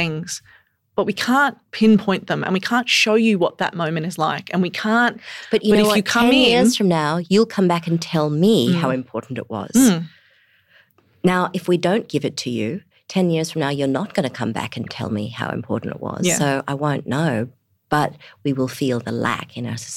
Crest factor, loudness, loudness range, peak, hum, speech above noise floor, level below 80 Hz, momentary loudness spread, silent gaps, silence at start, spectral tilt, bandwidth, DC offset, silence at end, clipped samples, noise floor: 14 dB; -19 LUFS; 6 LU; -6 dBFS; none; 38 dB; -58 dBFS; 12 LU; none; 0 s; -5 dB/octave; 16 kHz; under 0.1%; 0 s; under 0.1%; -57 dBFS